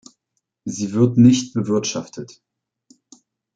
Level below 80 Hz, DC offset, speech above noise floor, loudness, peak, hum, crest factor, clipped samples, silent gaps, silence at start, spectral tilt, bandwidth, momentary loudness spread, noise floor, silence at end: -60 dBFS; under 0.1%; 58 dB; -18 LUFS; -2 dBFS; none; 18 dB; under 0.1%; none; 0.65 s; -6 dB/octave; 9 kHz; 22 LU; -76 dBFS; 1.3 s